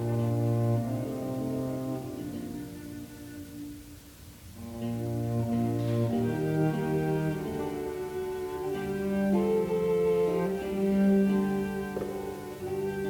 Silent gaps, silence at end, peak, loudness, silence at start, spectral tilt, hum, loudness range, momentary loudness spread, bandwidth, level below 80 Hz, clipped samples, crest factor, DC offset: none; 0 s; -16 dBFS; -30 LUFS; 0 s; -8 dB/octave; none; 10 LU; 16 LU; 19.5 kHz; -54 dBFS; under 0.1%; 14 dB; under 0.1%